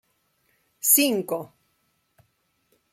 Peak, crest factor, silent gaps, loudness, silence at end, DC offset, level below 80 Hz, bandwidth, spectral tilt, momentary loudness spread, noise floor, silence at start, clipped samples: -2 dBFS; 26 dB; none; -21 LUFS; 1.45 s; under 0.1%; -78 dBFS; 16.5 kHz; -2 dB/octave; 16 LU; -71 dBFS; 0.85 s; under 0.1%